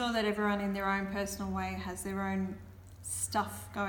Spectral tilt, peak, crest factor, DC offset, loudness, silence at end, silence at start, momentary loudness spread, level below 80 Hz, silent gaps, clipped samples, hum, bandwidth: -4 dB/octave; -18 dBFS; 16 dB; under 0.1%; -34 LUFS; 0 s; 0 s; 9 LU; -54 dBFS; none; under 0.1%; none; 19 kHz